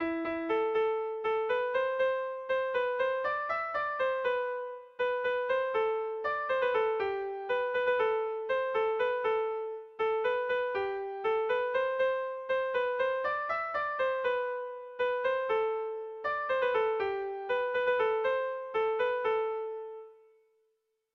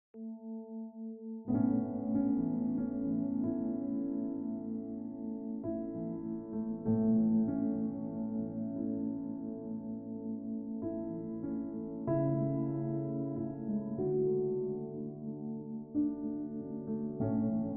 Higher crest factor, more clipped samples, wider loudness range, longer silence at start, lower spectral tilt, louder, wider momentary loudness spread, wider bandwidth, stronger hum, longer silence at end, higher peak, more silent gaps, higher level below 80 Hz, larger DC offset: about the same, 12 dB vs 16 dB; neither; second, 1 LU vs 5 LU; second, 0 s vs 0.15 s; second, -5 dB/octave vs -11 dB/octave; first, -31 LUFS vs -36 LUFS; second, 6 LU vs 10 LU; first, 6 kHz vs 2.1 kHz; neither; first, 1 s vs 0 s; about the same, -18 dBFS vs -20 dBFS; neither; second, -70 dBFS vs -64 dBFS; neither